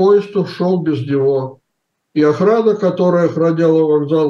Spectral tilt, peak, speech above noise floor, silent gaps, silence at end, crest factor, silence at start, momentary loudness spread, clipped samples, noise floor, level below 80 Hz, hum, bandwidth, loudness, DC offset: -8.5 dB/octave; -2 dBFS; 59 dB; none; 0 s; 12 dB; 0 s; 7 LU; under 0.1%; -72 dBFS; -68 dBFS; none; 7.2 kHz; -15 LUFS; under 0.1%